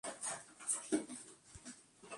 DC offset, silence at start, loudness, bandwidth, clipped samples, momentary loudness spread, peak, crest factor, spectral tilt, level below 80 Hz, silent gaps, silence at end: under 0.1%; 0.05 s; -41 LUFS; 11.5 kHz; under 0.1%; 17 LU; -22 dBFS; 22 dB; -2 dB/octave; -74 dBFS; none; 0 s